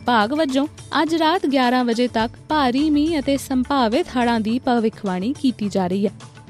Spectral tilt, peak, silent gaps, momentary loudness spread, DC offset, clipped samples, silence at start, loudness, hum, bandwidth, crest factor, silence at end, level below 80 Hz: -5.5 dB/octave; -6 dBFS; none; 5 LU; under 0.1%; under 0.1%; 0 s; -20 LUFS; none; 14 kHz; 14 dB; 0.05 s; -48 dBFS